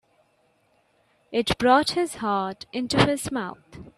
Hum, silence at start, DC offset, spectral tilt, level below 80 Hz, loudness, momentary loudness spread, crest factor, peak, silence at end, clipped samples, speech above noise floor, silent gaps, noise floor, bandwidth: none; 1.3 s; under 0.1%; -4.5 dB/octave; -52 dBFS; -24 LUFS; 12 LU; 22 dB; -4 dBFS; 0.1 s; under 0.1%; 42 dB; none; -66 dBFS; 14 kHz